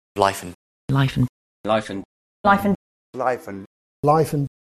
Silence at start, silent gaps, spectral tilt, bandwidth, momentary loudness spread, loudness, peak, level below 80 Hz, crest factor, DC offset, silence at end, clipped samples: 0.15 s; 0.55-0.88 s, 1.29-1.64 s, 2.05-2.44 s, 2.75-3.13 s, 3.66-4.03 s; -6.5 dB/octave; 13.5 kHz; 18 LU; -22 LUFS; -2 dBFS; -50 dBFS; 22 dB; under 0.1%; 0.2 s; under 0.1%